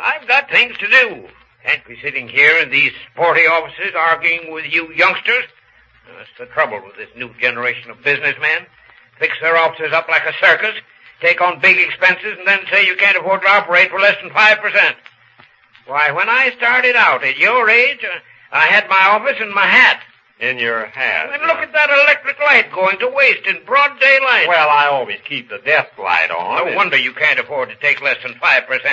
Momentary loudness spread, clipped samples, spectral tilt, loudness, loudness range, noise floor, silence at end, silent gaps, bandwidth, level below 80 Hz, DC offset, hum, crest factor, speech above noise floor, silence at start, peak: 10 LU; under 0.1%; -3 dB/octave; -13 LUFS; 6 LU; -50 dBFS; 0 s; none; 8 kHz; -66 dBFS; under 0.1%; none; 16 dB; 36 dB; 0 s; 0 dBFS